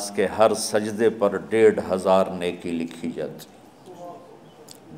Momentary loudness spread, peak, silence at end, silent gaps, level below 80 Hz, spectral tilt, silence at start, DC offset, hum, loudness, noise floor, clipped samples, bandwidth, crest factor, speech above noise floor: 22 LU; -4 dBFS; 0 s; none; -62 dBFS; -4.5 dB/octave; 0 s; under 0.1%; none; -22 LUFS; -46 dBFS; under 0.1%; 16 kHz; 20 dB; 24 dB